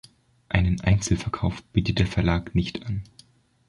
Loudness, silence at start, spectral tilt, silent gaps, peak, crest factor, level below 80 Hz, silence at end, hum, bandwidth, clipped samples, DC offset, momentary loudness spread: -25 LUFS; 0.5 s; -6 dB/octave; none; -2 dBFS; 22 dB; -34 dBFS; 0.65 s; none; 11.5 kHz; under 0.1%; under 0.1%; 8 LU